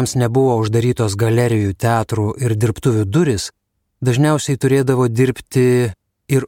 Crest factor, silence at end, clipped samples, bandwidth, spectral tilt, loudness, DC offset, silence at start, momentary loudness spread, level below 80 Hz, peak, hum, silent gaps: 14 dB; 0 s; under 0.1%; 16.5 kHz; -6.5 dB/octave; -17 LUFS; under 0.1%; 0 s; 5 LU; -46 dBFS; -2 dBFS; none; none